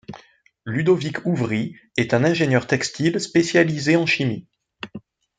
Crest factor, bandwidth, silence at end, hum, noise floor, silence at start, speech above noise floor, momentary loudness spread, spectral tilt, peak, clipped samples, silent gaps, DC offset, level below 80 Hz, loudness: 18 dB; 9.4 kHz; 0.4 s; none; -53 dBFS; 0.1 s; 33 dB; 18 LU; -5.5 dB/octave; -2 dBFS; under 0.1%; none; under 0.1%; -60 dBFS; -20 LUFS